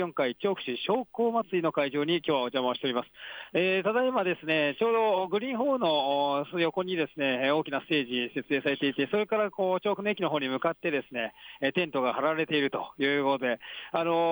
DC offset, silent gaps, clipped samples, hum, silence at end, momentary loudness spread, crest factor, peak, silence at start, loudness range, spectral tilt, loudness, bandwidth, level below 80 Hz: under 0.1%; none; under 0.1%; none; 0 s; 5 LU; 14 dB; -14 dBFS; 0 s; 2 LU; -7.5 dB/octave; -28 LUFS; over 20 kHz; -76 dBFS